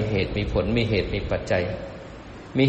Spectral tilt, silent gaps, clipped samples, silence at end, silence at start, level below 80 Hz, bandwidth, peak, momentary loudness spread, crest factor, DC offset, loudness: -7 dB/octave; none; under 0.1%; 0 s; 0 s; -36 dBFS; 8.4 kHz; -8 dBFS; 17 LU; 18 dB; under 0.1%; -25 LUFS